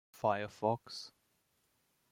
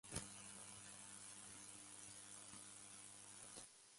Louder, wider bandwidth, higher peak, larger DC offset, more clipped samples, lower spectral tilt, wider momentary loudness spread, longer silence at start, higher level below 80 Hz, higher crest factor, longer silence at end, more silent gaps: first, -37 LUFS vs -55 LUFS; first, 16.5 kHz vs 11.5 kHz; first, -18 dBFS vs -32 dBFS; neither; neither; first, -5.5 dB/octave vs -2 dB/octave; first, 12 LU vs 3 LU; about the same, 0.15 s vs 0.05 s; about the same, -80 dBFS vs -76 dBFS; about the same, 22 dB vs 26 dB; first, 1.05 s vs 0 s; neither